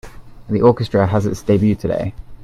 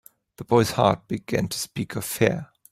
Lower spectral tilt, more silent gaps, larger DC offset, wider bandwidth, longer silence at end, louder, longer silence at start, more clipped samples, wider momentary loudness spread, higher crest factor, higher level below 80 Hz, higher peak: first, -8 dB/octave vs -5 dB/octave; neither; neither; second, 13 kHz vs 16 kHz; second, 0 s vs 0.25 s; first, -17 LUFS vs -24 LUFS; second, 0.05 s vs 0.4 s; neither; about the same, 9 LU vs 9 LU; about the same, 18 dB vs 22 dB; first, -40 dBFS vs -54 dBFS; about the same, 0 dBFS vs -2 dBFS